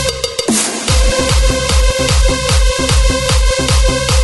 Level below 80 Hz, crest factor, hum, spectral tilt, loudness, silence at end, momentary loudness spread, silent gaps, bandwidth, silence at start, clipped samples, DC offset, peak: -14 dBFS; 12 dB; none; -3.5 dB/octave; -13 LUFS; 0 s; 1 LU; none; 12 kHz; 0 s; under 0.1%; under 0.1%; 0 dBFS